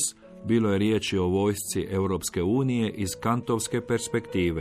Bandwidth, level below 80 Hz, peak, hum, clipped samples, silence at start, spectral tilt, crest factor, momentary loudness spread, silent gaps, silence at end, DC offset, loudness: 15 kHz; -52 dBFS; -12 dBFS; none; under 0.1%; 0 s; -5 dB/octave; 14 dB; 5 LU; none; 0 s; under 0.1%; -26 LUFS